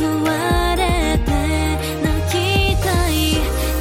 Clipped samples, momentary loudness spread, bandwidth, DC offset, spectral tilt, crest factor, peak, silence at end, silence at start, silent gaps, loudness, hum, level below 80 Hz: under 0.1%; 4 LU; 16.5 kHz; under 0.1%; -5 dB/octave; 10 dB; -6 dBFS; 0 s; 0 s; none; -18 LUFS; none; -24 dBFS